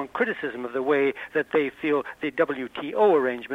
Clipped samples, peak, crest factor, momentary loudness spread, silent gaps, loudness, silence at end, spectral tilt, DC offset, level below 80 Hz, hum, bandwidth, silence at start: under 0.1%; -8 dBFS; 16 dB; 10 LU; none; -25 LUFS; 0 s; -6.5 dB/octave; under 0.1%; -66 dBFS; none; 6.2 kHz; 0 s